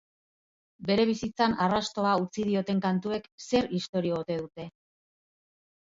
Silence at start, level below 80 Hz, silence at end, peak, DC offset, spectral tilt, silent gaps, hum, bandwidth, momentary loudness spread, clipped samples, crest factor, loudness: 0.8 s; -60 dBFS; 1.15 s; -12 dBFS; under 0.1%; -6 dB/octave; 3.32-3.38 s, 3.89-3.93 s; none; 7.8 kHz; 10 LU; under 0.1%; 18 dB; -28 LUFS